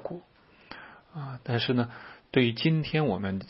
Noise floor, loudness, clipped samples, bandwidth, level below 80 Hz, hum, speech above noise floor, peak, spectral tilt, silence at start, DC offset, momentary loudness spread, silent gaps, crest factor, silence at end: -58 dBFS; -28 LUFS; under 0.1%; 5.8 kHz; -62 dBFS; none; 31 dB; -10 dBFS; -10.5 dB/octave; 0 s; under 0.1%; 21 LU; none; 20 dB; 0 s